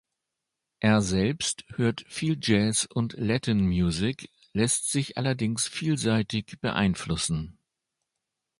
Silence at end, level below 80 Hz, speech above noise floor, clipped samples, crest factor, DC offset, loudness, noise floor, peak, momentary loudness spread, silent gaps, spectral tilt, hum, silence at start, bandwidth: 1.1 s; -48 dBFS; 59 dB; under 0.1%; 20 dB; under 0.1%; -27 LUFS; -85 dBFS; -6 dBFS; 7 LU; none; -4.5 dB/octave; none; 0.8 s; 11.5 kHz